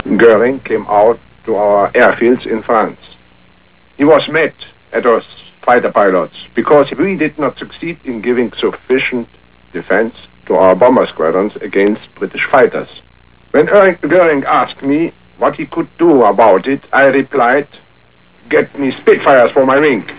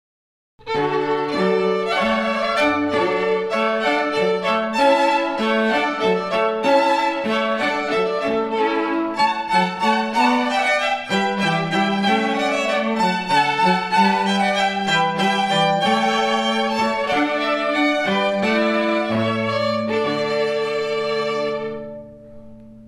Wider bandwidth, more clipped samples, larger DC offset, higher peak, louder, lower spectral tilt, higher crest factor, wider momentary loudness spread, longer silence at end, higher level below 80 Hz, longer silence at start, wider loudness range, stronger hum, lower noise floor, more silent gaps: second, 4 kHz vs 14 kHz; neither; first, 0.5% vs under 0.1%; first, 0 dBFS vs -4 dBFS; first, -12 LUFS vs -19 LUFS; first, -9.5 dB/octave vs -4.5 dB/octave; about the same, 12 dB vs 16 dB; first, 12 LU vs 4 LU; about the same, 0 s vs 0 s; first, -50 dBFS vs -58 dBFS; second, 0.05 s vs 0.65 s; about the same, 3 LU vs 2 LU; neither; first, -48 dBFS vs -40 dBFS; neither